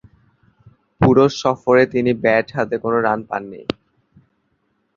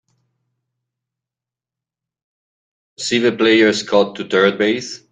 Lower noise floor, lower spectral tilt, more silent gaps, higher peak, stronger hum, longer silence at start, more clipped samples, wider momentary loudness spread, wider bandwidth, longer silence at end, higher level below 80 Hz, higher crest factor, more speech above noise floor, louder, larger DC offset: second, -67 dBFS vs -88 dBFS; first, -6.5 dB/octave vs -4 dB/octave; neither; about the same, -2 dBFS vs -2 dBFS; neither; second, 1 s vs 3 s; neither; first, 14 LU vs 7 LU; second, 7.4 kHz vs 9.4 kHz; first, 1.25 s vs 0.15 s; first, -46 dBFS vs -62 dBFS; about the same, 18 dB vs 18 dB; second, 50 dB vs 72 dB; about the same, -17 LUFS vs -16 LUFS; neither